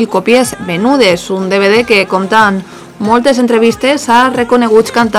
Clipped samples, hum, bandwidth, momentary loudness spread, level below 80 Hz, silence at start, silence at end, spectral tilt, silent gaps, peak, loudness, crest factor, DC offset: 2%; none; 16 kHz; 5 LU; -44 dBFS; 0 s; 0 s; -4.5 dB/octave; none; 0 dBFS; -9 LUFS; 10 dB; under 0.1%